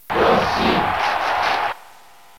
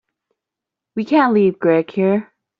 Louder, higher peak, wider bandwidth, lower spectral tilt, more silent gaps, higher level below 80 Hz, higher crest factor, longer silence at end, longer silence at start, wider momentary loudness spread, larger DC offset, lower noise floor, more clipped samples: second, -19 LUFS vs -16 LUFS; about the same, -4 dBFS vs -2 dBFS; first, 17 kHz vs 5.8 kHz; second, -4.5 dB/octave vs -6 dB/octave; neither; first, -44 dBFS vs -64 dBFS; about the same, 16 dB vs 16 dB; first, 0.6 s vs 0.4 s; second, 0.1 s vs 0.95 s; second, 7 LU vs 10 LU; first, 0.6% vs under 0.1%; second, -47 dBFS vs -85 dBFS; neither